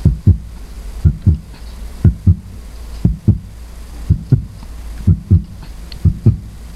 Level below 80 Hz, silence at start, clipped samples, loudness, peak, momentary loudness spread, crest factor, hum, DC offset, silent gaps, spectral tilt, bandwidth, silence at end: -22 dBFS; 0 s; under 0.1%; -16 LUFS; 0 dBFS; 19 LU; 16 dB; none; under 0.1%; none; -9 dB/octave; 12.5 kHz; 0 s